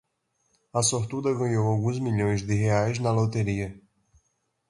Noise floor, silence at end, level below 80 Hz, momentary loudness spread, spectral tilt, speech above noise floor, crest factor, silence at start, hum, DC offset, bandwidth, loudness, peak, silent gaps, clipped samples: -74 dBFS; 0.9 s; -52 dBFS; 5 LU; -5.5 dB/octave; 49 dB; 18 dB; 0.75 s; none; under 0.1%; 11.5 kHz; -26 LUFS; -10 dBFS; none; under 0.1%